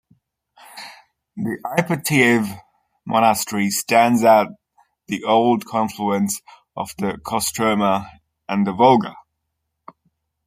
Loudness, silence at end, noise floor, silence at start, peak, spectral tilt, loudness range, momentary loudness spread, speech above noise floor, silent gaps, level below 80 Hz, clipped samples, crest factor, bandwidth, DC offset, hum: -19 LUFS; 1.25 s; -76 dBFS; 0.75 s; -2 dBFS; -4.5 dB/octave; 4 LU; 18 LU; 58 dB; none; -60 dBFS; under 0.1%; 20 dB; 16 kHz; under 0.1%; none